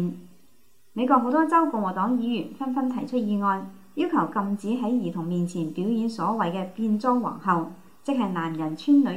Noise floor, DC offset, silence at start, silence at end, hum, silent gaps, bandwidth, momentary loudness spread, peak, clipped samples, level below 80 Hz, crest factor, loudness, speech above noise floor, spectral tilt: -63 dBFS; 0.3%; 0 s; 0 s; none; none; 15.5 kHz; 9 LU; -6 dBFS; under 0.1%; -72 dBFS; 18 dB; -25 LUFS; 39 dB; -7.5 dB/octave